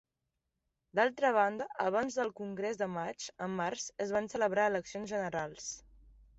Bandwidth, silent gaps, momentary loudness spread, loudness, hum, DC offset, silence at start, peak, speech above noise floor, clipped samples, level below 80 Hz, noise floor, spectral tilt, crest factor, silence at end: 8.2 kHz; none; 11 LU; -34 LUFS; none; under 0.1%; 0.95 s; -16 dBFS; 52 dB; under 0.1%; -68 dBFS; -86 dBFS; -4 dB/octave; 20 dB; 0.6 s